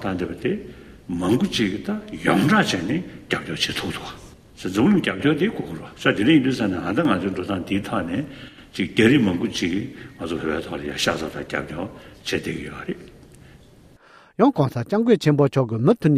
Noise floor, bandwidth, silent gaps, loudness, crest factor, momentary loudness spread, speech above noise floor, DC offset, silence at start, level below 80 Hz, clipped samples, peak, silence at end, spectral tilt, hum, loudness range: -50 dBFS; 15 kHz; none; -22 LUFS; 20 dB; 16 LU; 29 dB; under 0.1%; 0 s; -50 dBFS; under 0.1%; -2 dBFS; 0 s; -6 dB/octave; none; 6 LU